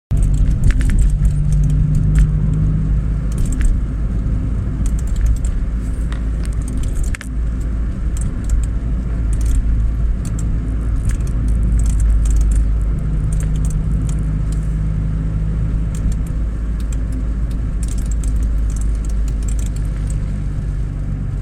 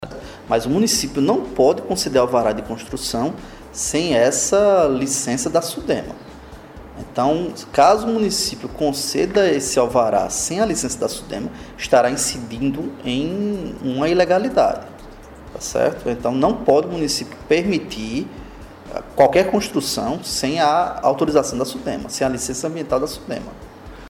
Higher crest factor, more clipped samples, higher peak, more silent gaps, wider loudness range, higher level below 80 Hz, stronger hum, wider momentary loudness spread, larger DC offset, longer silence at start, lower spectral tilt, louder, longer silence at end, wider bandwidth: about the same, 14 dB vs 16 dB; neither; about the same, -2 dBFS vs -2 dBFS; neither; about the same, 4 LU vs 3 LU; first, -16 dBFS vs -44 dBFS; neither; second, 6 LU vs 15 LU; neither; about the same, 0.1 s vs 0 s; first, -7.5 dB/octave vs -4 dB/octave; about the same, -20 LUFS vs -19 LUFS; about the same, 0 s vs 0 s; second, 10.5 kHz vs 18 kHz